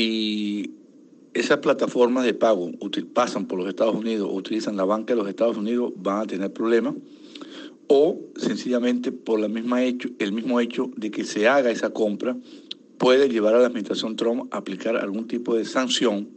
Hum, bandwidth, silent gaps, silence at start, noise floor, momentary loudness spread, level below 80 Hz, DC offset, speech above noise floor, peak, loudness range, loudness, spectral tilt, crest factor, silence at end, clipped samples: none; 8.8 kHz; none; 0 s; -51 dBFS; 11 LU; -74 dBFS; under 0.1%; 28 dB; -6 dBFS; 3 LU; -23 LUFS; -4.5 dB/octave; 18 dB; 0.05 s; under 0.1%